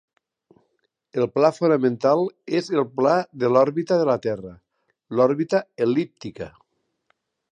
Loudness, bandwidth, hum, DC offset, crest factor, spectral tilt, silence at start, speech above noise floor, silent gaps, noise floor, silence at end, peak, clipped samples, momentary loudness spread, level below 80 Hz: -22 LUFS; 9.6 kHz; none; under 0.1%; 20 dB; -7 dB/octave; 1.15 s; 51 dB; none; -72 dBFS; 1.05 s; -4 dBFS; under 0.1%; 14 LU; -64 dBFS